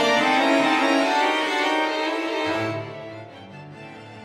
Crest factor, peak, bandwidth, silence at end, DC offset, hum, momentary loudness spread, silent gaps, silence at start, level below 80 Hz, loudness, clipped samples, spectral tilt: 16 dB; -8 dBFS; 15.5 kHz; 0 s; under 0.1%; none; 22 LU; none; 0 s; -68 dBFS; -21 LUFS; under 0.1%; -3.5 dB/octave